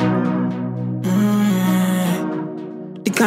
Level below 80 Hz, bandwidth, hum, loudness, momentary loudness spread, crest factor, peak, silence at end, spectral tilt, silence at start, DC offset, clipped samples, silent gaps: -62 dBFS; 16 kHz; none; -20 LUFS; 10 LU; 16 dB; -2 dBFS; 0 s; -6 dB/octave; 0 s; under 0.1%; under 0.1%; none